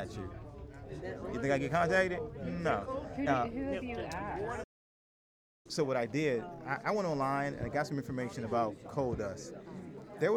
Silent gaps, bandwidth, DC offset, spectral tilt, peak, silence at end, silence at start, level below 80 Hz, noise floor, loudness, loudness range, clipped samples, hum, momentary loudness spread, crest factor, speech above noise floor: 4.64-5.65 s; 15 kHz; under 0.1%; -6 dB/octave; -18 dBFS; 0 s; 0 s; -56 dBFS; under -90 dBFS; -35 LUFS; 4 LU; under 0.1%; none; 15 LU; 18 dB; over 55 dB